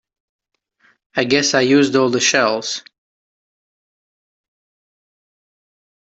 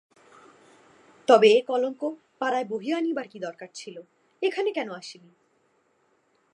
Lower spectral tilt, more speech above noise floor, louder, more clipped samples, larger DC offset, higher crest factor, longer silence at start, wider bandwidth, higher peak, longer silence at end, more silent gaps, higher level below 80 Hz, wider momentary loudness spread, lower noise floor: about the same, -3 dB/octave vs -4 dB/octave; about the same, 45 dB vs 43 dB; first, -16 LUFS vs -25 LUFS; neither; neither; about the same, 18 dB vs 22 dB; second, 1.15 s vs 1.3 s; second, 8.2 kHz vs 10.5 kHz; about the same, -2 dBFS vs -4 dBFS; first, 3.2 s vs 1.4 s; neither; first, -64 dBFS vs -86 dBFS; second, 11 LU vs 22 LU; second, -60 dBFS vs -68 dBFS